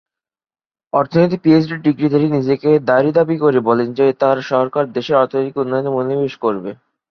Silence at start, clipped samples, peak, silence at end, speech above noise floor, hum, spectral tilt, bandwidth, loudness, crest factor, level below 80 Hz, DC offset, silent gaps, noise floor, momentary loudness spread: 0.95 s; under 0.1%; -2 dBFS; 0.35 s; over 75 dB; none; -8.5 dB/octave; 6.4 kHz; -16 LUFS; 14 dB; -58 dBFS; under 0.1%; none; under -90 dBFS; 6 LU